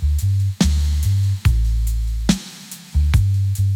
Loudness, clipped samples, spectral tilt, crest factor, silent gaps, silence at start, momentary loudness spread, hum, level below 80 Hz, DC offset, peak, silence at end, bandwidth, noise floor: -19 LUFS; under 0.1%; -5.5 dB/octave; 14 dB; none; 0 s; 6 LU; none; -22 dBFS; under 0.1%; -4 dBFS; 0 s; 16.5 kHz; -37 dBFS